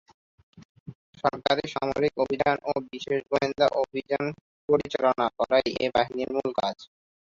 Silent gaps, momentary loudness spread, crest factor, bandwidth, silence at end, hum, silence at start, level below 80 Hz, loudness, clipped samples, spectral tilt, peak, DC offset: 0.65-0.86 s, 0.95-1.13 s, 4.41-4.68 s; 7 LU; 20 dB; 7.6 kHz; 0.35 s; none; 0.6 s; -58 dBFS; -26 LUFS; under 0.1%; -5.5 dB/octave; -8 dBFS; under 0.1%